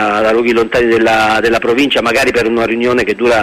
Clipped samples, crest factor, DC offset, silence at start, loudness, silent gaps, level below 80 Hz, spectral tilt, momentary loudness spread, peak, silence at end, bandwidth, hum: under 0.1%; 10 dB; under 0.1%; 0 s; -11 LUFS; none; -38 dBFS; -4.5 dB/octave; 3 LU; -2 dBFS; 0 s; 15.5 kHz; none